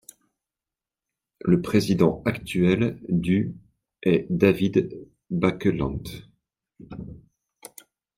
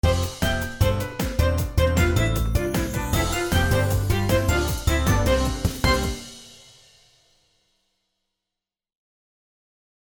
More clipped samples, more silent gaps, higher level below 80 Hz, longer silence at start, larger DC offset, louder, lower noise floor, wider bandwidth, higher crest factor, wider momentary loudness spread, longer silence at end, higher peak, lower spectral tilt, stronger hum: neither; neither; second, -50 dBFS vs -30 dBFS; first, 1.45 s vs 0.05 s; neither; about the same, -24 LUFS vs -23 LUFS; about the same, -90 dBFS vs -87 dBFS; second, 16 kHz vs over 20 kHz; about the same, 20 dB vs 18 dB; first, 22 LU vs 5 LU; second, 1 s vs 3.55 s; about the same, -4 dBFS vs -6 dBFS; first, -7.5 dB/octave vs -5 dB/octave; neither